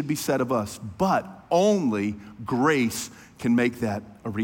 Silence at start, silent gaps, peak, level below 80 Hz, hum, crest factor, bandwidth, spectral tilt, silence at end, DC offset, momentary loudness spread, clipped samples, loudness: 0 s; none; -10 dBFS; -58 dBFS; none; 16 dB; 17 kHz; -5.5 dB/octave; 0 s; under 0.1%; 11 LU; under 0.1%; -25 LUFS